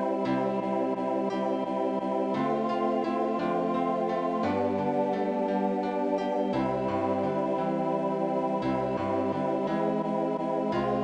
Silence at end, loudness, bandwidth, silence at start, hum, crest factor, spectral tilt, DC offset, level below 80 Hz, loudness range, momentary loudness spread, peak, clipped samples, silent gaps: 0 s; -28 LUFS; 9.6 kHz; 0 s; none; 12 dB; -8 dB/octave; under 0.1%; -62 dBFS; 1 LU; 1 LU; -16 dBFS; under 0.1%; none